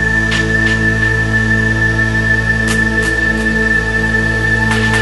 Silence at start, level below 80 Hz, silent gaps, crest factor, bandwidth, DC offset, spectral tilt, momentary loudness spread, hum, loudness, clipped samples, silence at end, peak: 0 s; -24 dBFS; none; 12 dB; 12 kHz; under 0.1%; -5 dB/octave; 1 LU; none; -12 LUFS; under 0.1%; 0 s; -2 dBFS